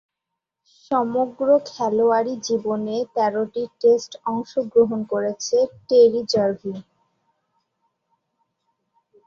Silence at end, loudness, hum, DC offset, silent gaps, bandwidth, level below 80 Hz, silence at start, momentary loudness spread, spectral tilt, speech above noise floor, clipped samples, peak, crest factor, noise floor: 2.45 s; -21 LUFS; none; under 0.1%; none; 7.2 kHz; -68 dBFS; 0.9 s; 9 LU; -5 dB/octave; 63 dB; under 0.1%; -4 dBFS; 18 dB; -83 dBFS